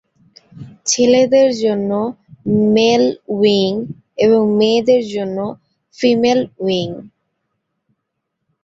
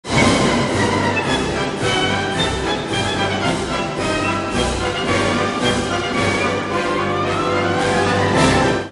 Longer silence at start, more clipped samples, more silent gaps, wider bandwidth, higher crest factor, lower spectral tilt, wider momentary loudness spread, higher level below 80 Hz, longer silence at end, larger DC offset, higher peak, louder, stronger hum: first, 0.55 s vs 0.05 s; neither; neither; second, 8 kHz vs 11.5 kHz; about the same, 14 dB vs 16 dB; about the same, -4.5 dB/octave vs -4.5 dB/octave; first, 12 LU vs 5 LU; second, -58 dBFS vs -36 dBFS; first, 1.55 s vs 0 s; neither; about the same, -2 dBFS vs -2 dBFS; first, -15 LUFS vs -18 LUFS; neither